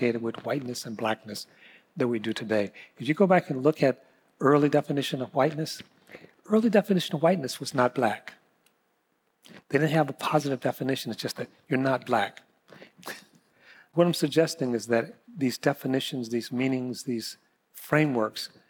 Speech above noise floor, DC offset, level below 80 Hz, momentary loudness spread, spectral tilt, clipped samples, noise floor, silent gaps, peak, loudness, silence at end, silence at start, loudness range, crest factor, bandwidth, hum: 46 dB; under 0.1%; -78 dBFS; 15 LU; -5.5 dB/octave; under 0.1%; -73 dBFS; none; -10 dBFS; -27 LUFS; 0.25 s; 0 s; 4 LU; 18 dB; 19 kHz; none